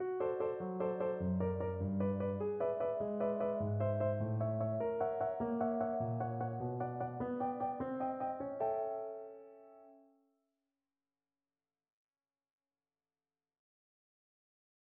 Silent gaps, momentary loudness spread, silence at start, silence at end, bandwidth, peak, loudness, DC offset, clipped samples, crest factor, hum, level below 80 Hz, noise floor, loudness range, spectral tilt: none; 4 LU; 0 s; 4.85 s; 3.4 kHz; -24 dBFS; -38 LUFS; under 0.1%; under 0.1%; 16 dB; none; -70 dBFS; under -90 dBFS; 7 LU; -9.5 dB/octave